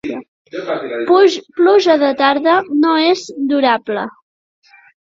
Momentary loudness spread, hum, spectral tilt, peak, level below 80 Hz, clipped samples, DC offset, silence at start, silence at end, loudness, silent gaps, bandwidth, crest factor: 15 LU; none; -4 dB/octave; 0 dBFS; -62 dBFS; under 0.1%; under 0.1%; 0.05 s; 0.95 s; -14 LUFS; 0.28-0.45 s; 7.6 kHz; 14 dB